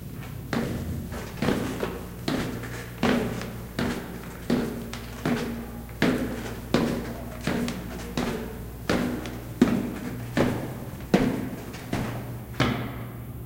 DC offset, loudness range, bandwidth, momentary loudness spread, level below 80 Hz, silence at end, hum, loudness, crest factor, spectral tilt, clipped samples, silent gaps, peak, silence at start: under 0.1%; 2 LU; 17 kHz; 11 LU; -42 dBFS; 0 s; none; -29 LUFS; 24 dB; -6 dB/octave; under 0.1%; none; -4 dBFS; 0 s